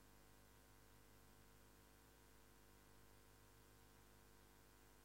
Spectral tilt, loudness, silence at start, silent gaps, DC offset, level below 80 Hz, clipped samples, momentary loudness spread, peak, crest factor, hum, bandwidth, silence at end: -3.5 dB/octave; -69 LUFS; 0 s; none; under 0.1%; -76 dBFS; under 0.1%; 0 LU; -56 dBFS; 14 dB; none; 16 kHz; 0 s